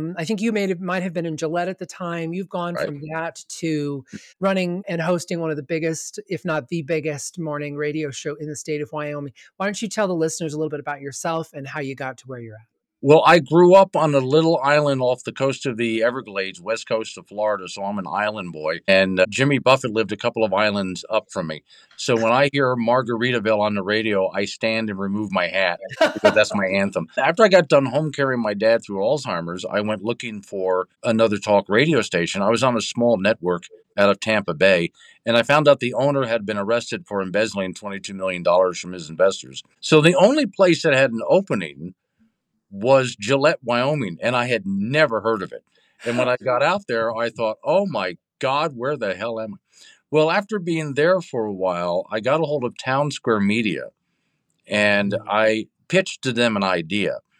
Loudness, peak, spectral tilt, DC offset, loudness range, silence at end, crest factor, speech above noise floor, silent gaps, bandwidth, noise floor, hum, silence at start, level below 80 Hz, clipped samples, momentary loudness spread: -21 LUFS; -2 dBFS; -5 dB/octave; under 0.1%; 8 LU; 0.2 s; 18 dB; 51 dB; none; 12.5 kHz; -72 dBFS; none; 0 s; -66 dBFS; under 0.1%; 12 LU